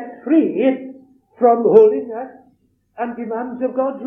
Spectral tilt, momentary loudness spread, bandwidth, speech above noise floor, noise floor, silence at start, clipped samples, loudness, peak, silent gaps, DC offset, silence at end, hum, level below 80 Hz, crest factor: -9.5 dB/octave; 18 LU; 3.6 kHz; 43 dB; -59 dBFS; 0 s; under 0.1%; -17 LUFS; 0 dBFS; none; under 0.1%; 0 s; none; -70 dBFS; 18 dB